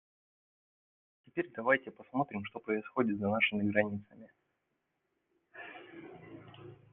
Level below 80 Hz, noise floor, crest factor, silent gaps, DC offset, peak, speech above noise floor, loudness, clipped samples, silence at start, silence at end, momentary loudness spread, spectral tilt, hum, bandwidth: -78 dBFS; -83 dBFS; 24 dB; none; under 0.1%; -14 dBFS; 49 dB; -33 LUFS; under 0.1%; 1.35 s; 0.2 s; 22 LU; -4 dB/octave; none; 3.8 kHz